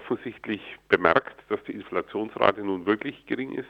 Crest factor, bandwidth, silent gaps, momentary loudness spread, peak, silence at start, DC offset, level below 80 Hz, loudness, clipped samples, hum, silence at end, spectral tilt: 26 dB; 6.6 kHz; none; 11 LU; 0 dBFS; 0 s; under 0.1%; -62 dBFS; -27 LUFS; under 0.1%; none; 0.05 s; -7 dB/octave